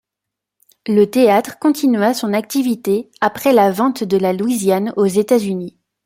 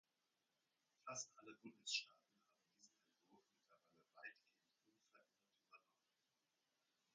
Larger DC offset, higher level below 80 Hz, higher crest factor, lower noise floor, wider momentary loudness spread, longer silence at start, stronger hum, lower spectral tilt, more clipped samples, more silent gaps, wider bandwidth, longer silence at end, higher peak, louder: neither; first, -60 dBFS vs under -90 dBFS; second, 14 dB vs 30 dB; second, -82 dBFS vs under -90 dBFS; second, 7 LU vs 16 LU; second, 0.85 s vs 1.05 s; neither; first, -5.5 dB/octave vs 0.5 dB/octave; neither; neither; first, 16.5 kHz vs 7.4 kHz; second, 0.35 s vs 1.35 s; first, -2 dBFS vs -32 dBFS; first, -16 LUFS vs -51 LUFS